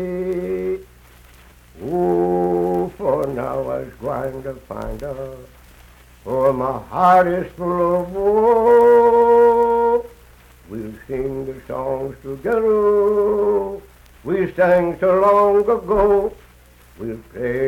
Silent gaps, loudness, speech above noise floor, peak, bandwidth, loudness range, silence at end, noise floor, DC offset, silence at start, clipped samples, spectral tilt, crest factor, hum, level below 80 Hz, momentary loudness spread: none; -18 LUFS; 30 dB; -4 dBFS; 16 kHz; 9 LU; 0 s; -48 dBFS; under 0.1%; 0 s; under 0.1%; -8 dB/octave; 14 dB; none; -42 dBFS; 18 LU